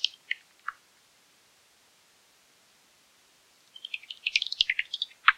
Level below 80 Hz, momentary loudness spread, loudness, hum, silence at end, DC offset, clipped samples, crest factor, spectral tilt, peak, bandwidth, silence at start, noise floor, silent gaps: -72 dBFS; 17 LU; -30 LUFS; none; 0.05 s; under 0.1%; under 0.1%; 30 dB; 3.5 dB/octave; -4 dBFS; 16 kHz; 0 s; -63 dBFS; none